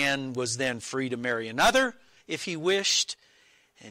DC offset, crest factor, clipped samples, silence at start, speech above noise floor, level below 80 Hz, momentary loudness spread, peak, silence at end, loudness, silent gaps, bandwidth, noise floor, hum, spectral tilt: under 0.1%; 16 dB; under 0.1%; 0 s; 34 dB; -56 dBFS; 10 LU; -12 dBFS; 0 s; -27 LUFS; none; 16 kHz; -62 dBFS; none; -2.5 dB/octave